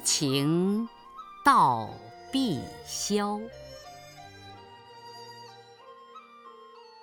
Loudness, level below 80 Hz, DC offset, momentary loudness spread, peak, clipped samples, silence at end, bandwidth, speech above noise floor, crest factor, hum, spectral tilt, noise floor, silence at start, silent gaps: -27 LUFS; -64 dBFS; under 0.1%; 26 LU; -10 dBFS; under 0.1%; 0.2 s; over 20 kHz; 24 dB; 22 dB; none; -4 dB/octave; -51 dBFS; 0 s; none